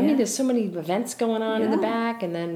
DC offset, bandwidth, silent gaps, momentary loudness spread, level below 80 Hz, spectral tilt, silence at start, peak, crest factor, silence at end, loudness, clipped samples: under 0.1%; 16 kHz; none; 5 LU; -76 dBFS; -5 dB/octave; 0 s; -10 dBFS; 14 dB; 0 s; -24 LUFS; under 0.1%